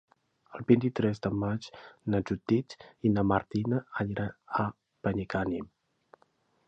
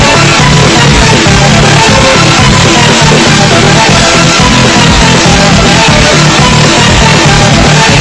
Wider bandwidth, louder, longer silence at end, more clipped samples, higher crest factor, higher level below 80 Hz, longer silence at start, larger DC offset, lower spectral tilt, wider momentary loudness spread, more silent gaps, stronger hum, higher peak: second, 8.2 kHz vs 11 kHz; second, -31 LUFS vs -3 LUFS; first, 1 s vs 0 s; second, under 0.1% vs 10%; first, 22 dB vs 4 dB; second, -56 dBFS vs -18 dBFS; first, 0.5 s vs 0 s; neither; first, -8.5 dB/octave vs -4 dB/octave; first, 13 LU vs 0 LU; neither; neither; second, -10 dBFS vs 0 dBFS